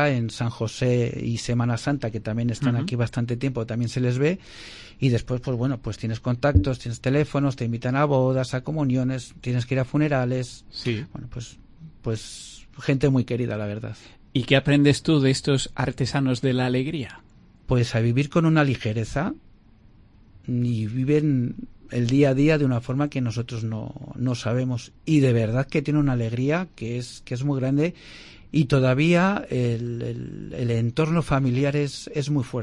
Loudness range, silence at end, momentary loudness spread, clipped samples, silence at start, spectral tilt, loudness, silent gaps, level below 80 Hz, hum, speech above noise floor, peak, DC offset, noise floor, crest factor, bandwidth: 4 LU; 0 s; 12 LU; under 0.1%; 0 s; -7 dB/octave; -24 LUFS; none; -44 dBFS; none; 29 dB; -4 dBFS; under 0.1%; -52 dBFS; 20 dB; 11 kHz